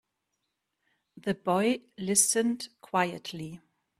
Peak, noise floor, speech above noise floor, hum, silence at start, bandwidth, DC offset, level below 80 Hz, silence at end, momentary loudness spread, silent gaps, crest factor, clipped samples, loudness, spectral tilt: -6 dBFS; -82 dBFS; 53 dB; none; 1.15 s; 15.5 kHz; under 0.1%; -72 dBFS; 0.4 s; 16 LU; none; 26 dB; under 0.1%; -28 LUFS; -3 dB/octave